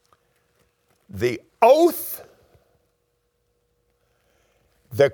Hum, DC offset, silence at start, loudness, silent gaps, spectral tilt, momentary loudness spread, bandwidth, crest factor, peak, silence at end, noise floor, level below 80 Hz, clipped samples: none; under 0.1%; 1.15 s; -20 LUFS; none; -5.5 dB/octave; 20 LU; over 20 kHz; 22 dB; -2 dBFS; 0 s; -71 dBFS; -66 dBFS; under 0.1%